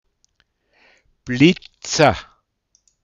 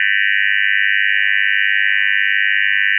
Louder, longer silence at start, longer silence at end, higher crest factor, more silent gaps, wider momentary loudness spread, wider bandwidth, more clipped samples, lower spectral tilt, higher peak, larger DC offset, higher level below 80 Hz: second, -17 LUFS vs -13 LUFS; first, 1.25 s vs 0 s; first, 0.8 s vs 0 s; first, 22 dB vs 12 dB; neither; first, 15 LU vs 0 LU; first, 8.6 kHz vs 3.2 kHz; neither; first, -5 dB/octave vs 5.5 dB/octave; about the same, 0 dBFS vs -2 dBFS; neither; first, -48 dBFS vs under -90 dBFS